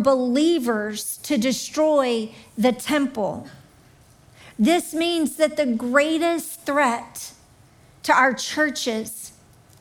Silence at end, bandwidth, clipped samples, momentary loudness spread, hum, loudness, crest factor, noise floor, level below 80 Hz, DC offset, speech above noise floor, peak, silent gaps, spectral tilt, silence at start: 0.5 s; 19 kHz; under 0.1%; 14 LU; none; -22 LUFS; 18 dB; -52 dBFS; -62 dBFS; under 0.1%; 31 dB; -4 dBFS; none; -3.5 dB/octave; 0 s